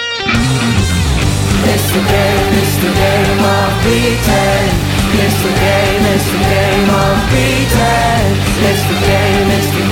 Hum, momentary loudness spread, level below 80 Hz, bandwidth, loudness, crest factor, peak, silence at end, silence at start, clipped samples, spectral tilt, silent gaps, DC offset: none; 2 LU; -22 dBFS; 17 kHz; -11 LUFS; 12 dB; 0 dBFS; 0 s; 0 s; under 0.1%; -5 dB/octave; none; under 0.1%